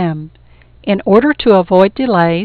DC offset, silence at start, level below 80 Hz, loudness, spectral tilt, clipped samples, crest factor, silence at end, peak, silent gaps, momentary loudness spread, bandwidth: under 0.1%; 0 s; -42 dBFS; -12 LUFS; -9 dB/octave; under 0.1%; 12 dB; 0 s; 0 dBFS; none; 12 LU; 5 kHz